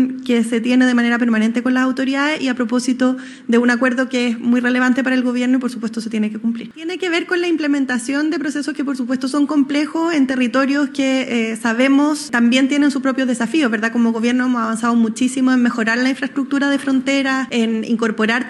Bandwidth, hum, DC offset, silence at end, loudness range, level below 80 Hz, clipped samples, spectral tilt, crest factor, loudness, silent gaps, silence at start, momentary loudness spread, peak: 12 kHz; none; under 0.1%; 0 s; 3 LU; -66 dBFS; under 0.1%; -4 dB/octave; 14 dB; -17 LUFS; none; 0 s; 6 LU; -2 dBFS